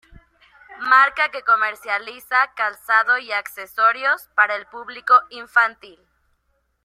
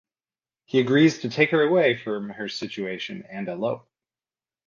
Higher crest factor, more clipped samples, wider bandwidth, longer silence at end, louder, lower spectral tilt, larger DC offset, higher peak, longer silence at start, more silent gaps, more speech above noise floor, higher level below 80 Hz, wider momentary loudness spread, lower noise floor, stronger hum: about the same, 20 dB vs 20 dB; neither; first, 16 kHz vs 7.4 kHz; about the same, 1 s vs 0.9 s; first, -18 LUFS vs -23 LUFS; second, -1 dB/octave vs -6 dB/octave; neither; about the same, -2 dBFS vs -4 dBFS; about the same, 0.7 s vs 0.75 s; neither; second, 49 dB vs over 67 dB; first, -62 dBFS vs -70 dBFS; second, 10 LU vs 14 LU; second, -69 dBFS vs under -90 dBFS; neither